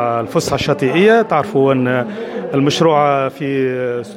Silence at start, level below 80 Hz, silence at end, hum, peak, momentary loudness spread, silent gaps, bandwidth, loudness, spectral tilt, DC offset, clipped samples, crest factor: 0 s; -50 dBFS; 0 s; none; -2 dBFS; 8 LU; none; 16 kHz; -15 LUFS; -5.5 dB/octave; under 0.1%; under 0.1%; 14 dB